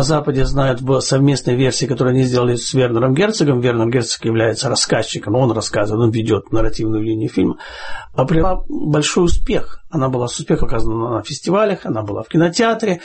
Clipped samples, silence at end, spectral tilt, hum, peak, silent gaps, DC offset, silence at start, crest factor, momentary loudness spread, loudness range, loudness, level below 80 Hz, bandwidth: under 0.1%; 0 s; -5.5 dB/octave; none; -2 dBFS; none; under 0.1%; 0 s; 12 dB; 6 LU; 3 LU; -17 LUFS; -28 dBFS; 8.8 kHz